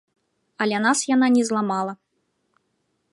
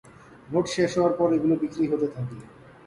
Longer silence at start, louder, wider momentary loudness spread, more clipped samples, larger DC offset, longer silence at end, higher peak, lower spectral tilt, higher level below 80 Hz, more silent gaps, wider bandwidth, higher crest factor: first, 0.6 s vs 0.3 s; first, -21 LUFS vs -25 LUFS; second, 9 LU vs 13 LU; neither; neither; first, 1.2 s vs 0.4 s; about the same, -8 dBFS vs -10 dBFS; second, -3.5 dB/octave vs -6.5 dB/octave; second, -74 dBFS vs -58 dBFS; neither; about the same, 11.5 kHz vs 11.5 kHz; about the same, 16 dB vs 16 dB